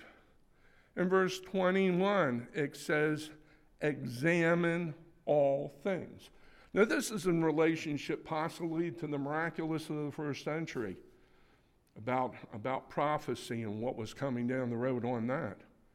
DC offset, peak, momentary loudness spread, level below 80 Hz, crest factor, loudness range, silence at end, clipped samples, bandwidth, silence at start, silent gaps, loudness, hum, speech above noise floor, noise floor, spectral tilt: under 0.1%; -14 dBFS; 10 LU; -66 dBFS; 20 dB; 6 LU; 0.4 s; under 0.1%; 16 kHz; 0 s; none; -34 LUFS; none; 35 dB; -68 dBFS; -6 dB/octave